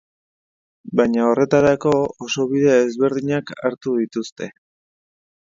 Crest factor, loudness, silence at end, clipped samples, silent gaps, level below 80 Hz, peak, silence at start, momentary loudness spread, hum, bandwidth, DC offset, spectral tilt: 18 dB; -19 LUFS; 1.05 s; under 0.1%; 4.32-4.36 s; -56 dBFS; -2 dBFS; 0.85 s; 11 LU; none; 7.6 kHz; under 0.1%; -6 dB/octave